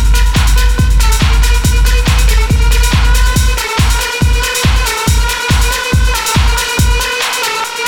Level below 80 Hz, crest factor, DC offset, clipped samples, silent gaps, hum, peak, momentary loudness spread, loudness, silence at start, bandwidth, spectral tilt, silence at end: -12 dBFS; 10 dB; under 0.1%; under 0.1%; none; none; 0 dBFS; 2 LU; -12 LUFS; 0 s; 18.5 kHz; -3.5 dB/octave; 0 s